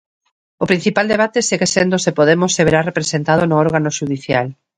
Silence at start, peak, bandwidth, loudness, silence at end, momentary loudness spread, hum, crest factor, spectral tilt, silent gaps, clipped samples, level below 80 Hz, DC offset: 0.6 s; 0 dBFS; 10.5 kHz; -15 LUFS; 0.25 s; 6 LU; none; 16 dB; -4.5 dB/octave; none; under 0.1%; -50 dBFS; under 0.1%